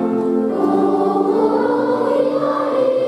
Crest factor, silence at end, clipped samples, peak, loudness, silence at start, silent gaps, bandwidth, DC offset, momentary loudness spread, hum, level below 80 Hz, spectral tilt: 12 dB; 0 s; under 0.1%; -4 dBFS; -17 LUFS; 0 s; none; 11.5 kHz; under 0.1%; 2 LU; none; -64 dBFS; -7.5 dB/octave